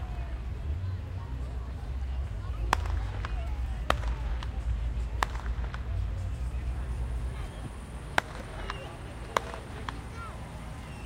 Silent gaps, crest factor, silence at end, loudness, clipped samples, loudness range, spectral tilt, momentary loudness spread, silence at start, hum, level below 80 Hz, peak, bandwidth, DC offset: none; 28 dB; 0 s; -35 LUFS; under 0.1%; 3 LU; -5.5 dB/octave; 10 LU; 0 s; none; -36 dBFS; -6 dBFS; 15 kHz; under 0.1%